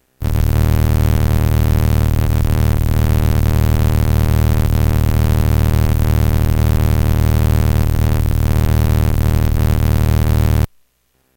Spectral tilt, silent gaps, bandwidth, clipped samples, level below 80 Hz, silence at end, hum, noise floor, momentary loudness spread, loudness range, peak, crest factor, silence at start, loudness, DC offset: -7 dB/octave; none; 17.5 kHz; under 0.1%; -18 dBFS; 0.7 s; none; -61 dBFS; 1 LU; 0 LU; -4 dBFS; 8 dB; 0.2 s; -15 LUFS; under 0.1%